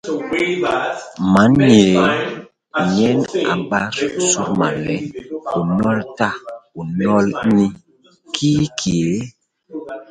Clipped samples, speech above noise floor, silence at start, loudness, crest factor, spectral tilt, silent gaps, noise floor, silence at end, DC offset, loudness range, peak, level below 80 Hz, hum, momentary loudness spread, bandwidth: under 0.1%; 33 dB; 0.05 s; -17 LUFS; 18 dB; -5 dB/octave; none; -49 dBFS; 0.1 s; under 0.1%; 4 LU; 0 dBFS; -48 dBFS; none; 16 LU; 10 kHz